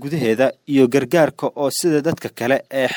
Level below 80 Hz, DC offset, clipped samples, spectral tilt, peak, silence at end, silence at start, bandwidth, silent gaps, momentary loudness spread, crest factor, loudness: -62 dBFS; under 0.1%; under 0.1%; -5 dB/octave; -2 dBFS; 0 s; 0 s; over 20 kHz; none; 6 LU; 16 dB; -18 LUFS